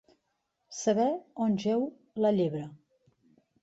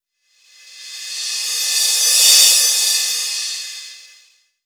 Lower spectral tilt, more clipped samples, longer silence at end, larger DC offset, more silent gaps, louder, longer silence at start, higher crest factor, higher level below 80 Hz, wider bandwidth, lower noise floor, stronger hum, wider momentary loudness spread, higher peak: first, -6 dB/octave vs 7.5 dB/octave; neither; first, 0.85 s vs 0.65 s; neither; neither; second, -30 LUFS vs -12 LUFS; about the same, 0.7 s vs 0.7 s; about the same, 16 dB vs 18 dB; first, -74 dBFS vs -86 dBFS; second, 8 kHz vs over 20 kHz; first, -80 dBFS vs -58 dBFS; neither; second, 12 LU vs 21 LU; second, -14 dBFS vs 0 dBFS